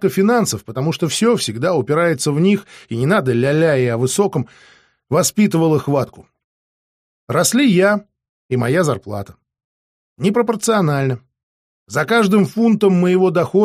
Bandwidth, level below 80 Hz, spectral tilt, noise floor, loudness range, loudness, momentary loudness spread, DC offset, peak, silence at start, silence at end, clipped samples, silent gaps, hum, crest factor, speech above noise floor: 15.5 kHz; -58 dBFS; -5.5 dB/octave; under -90 dBFS; 3 LU; -16 LUFS; 9 LU; under 0.1%; -2 dBFS; 0 s; 0 s; under 0.1%; 6.44-7.27 s, 8.29-8.49 s, 9.64-10.16 s, 11.43-11.86 s; none; 14 dB; over 74 dB